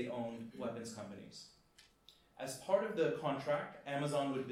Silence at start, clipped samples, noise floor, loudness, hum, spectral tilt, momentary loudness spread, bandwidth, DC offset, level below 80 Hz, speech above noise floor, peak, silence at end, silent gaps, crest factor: 0 s; under 0.1%; -68 dBFS; -39 LUFS; none; -5.5 dB/octave; 15 LU; 15.5 kHz; under 0.1%; -78 dBFS; 28 dB; -20 dBFS; 0 s; none; 20 dB